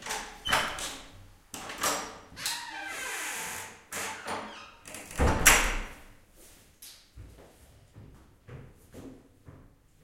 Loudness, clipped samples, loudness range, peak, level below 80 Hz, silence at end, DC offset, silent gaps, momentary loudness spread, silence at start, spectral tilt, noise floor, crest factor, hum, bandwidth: -29 LUFS; under 0.1%; 23 LU; -2 dBFS; -42 dBFS; 0.4 s; under 0.1%; none; 26 LU; 0 s; -2 dB/octave; -57 dBFS; 32 dB; none; 16.5 kHz